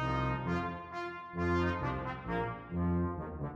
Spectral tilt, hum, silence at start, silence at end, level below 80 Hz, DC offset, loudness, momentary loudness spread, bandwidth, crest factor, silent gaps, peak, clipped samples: -8 dB/octave; none; 0 s; 0 s; -48 dBFS; under 0.1%; -36 LUFS; 8 LU; 7.4 kHz; 14 dB; none; -22 dBFS; under 0.1%